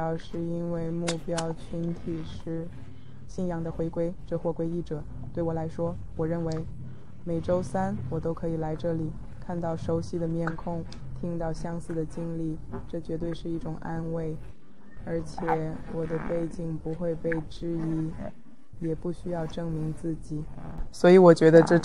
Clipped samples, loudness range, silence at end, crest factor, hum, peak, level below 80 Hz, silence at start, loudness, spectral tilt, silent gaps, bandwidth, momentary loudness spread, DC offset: under 0.1%; 3 LU; 0 s; 24 dB; none; -4 dBFS; -44 dBFS; 0 s; -29 LUFS; -7.5 dB/octave; none; 11 kHz; 9 LU; 1%